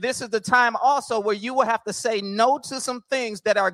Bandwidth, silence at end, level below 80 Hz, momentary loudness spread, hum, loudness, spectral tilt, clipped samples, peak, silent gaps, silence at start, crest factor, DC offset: 16 kHz; 0 s; -70 dBFS; 7 LU; none; -22 LUFS; -3 dB/octave; under 0.1%; -4 dBFS; none; 0 s; 18 dB; under 0.1%